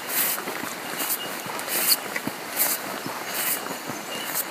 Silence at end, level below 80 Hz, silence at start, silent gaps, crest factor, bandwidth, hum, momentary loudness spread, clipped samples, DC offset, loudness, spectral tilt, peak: 0 s; -74 dBFS; 0 s; none; 22 dB; 15.5 kHz; none; 10 LU; under 0.1%; under 0.1%; -25 LUFS; -1 dB/octave; -6 dBFS